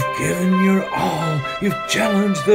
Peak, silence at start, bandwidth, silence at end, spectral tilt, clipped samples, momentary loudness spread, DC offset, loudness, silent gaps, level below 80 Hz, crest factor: -4 dBFS; 0 s; 16 kHz; 0 s; -5.5 dB/octave; under 0.1%; 5 LU; under 0.1%; -19 LUFS; none; -50 dBFS; 14 dB